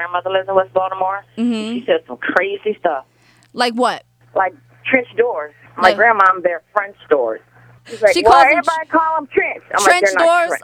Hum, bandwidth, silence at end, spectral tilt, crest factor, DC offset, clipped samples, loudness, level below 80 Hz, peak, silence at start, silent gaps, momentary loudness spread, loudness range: none; 18.5 kHz; 0.05 s; -3 dB/octave; 16 dB; under 0.1%; under 0.1%; -15 LUFS; -54 dBFS; 0 dBFS; 0 s; none; 11 LU; 6 LU